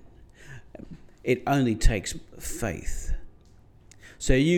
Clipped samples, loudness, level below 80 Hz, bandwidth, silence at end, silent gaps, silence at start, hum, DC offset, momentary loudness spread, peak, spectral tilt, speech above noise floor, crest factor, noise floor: under 0.1%; -28 LUFS; -32 dBFS; 17 kHz; 0 s; none; 0.4 s; none; under 0.1%; 23 LU; -4 dBFS; -5.5 dB/octave; 30 dB; 22 dB; -53 dBFS